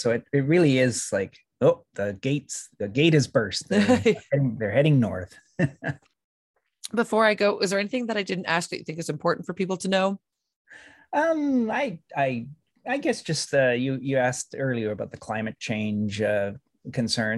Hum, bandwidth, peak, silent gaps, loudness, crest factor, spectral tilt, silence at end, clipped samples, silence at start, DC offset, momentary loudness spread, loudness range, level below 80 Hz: none; 12.5 kHz; -6 dBFS; 6.24-6.54 s, 10.56-10.65 s; -25 LUFS; 18 dB; -5.5 dB/octave; 0 s; under 0.1%; 0 s; under 0.1%; 12 LU; 5 LU; -64 dBFS